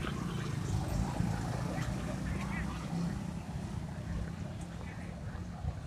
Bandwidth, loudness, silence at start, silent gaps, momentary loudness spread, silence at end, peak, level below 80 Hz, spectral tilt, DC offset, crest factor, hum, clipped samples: 15.5 kHz; -38 LUFS; 0 s; none; 8 LU; 0 s; -20 dBFS; -46 dBFS; -6.5 dB/octave; under 0.1%; 16 dB; none; under 0.1%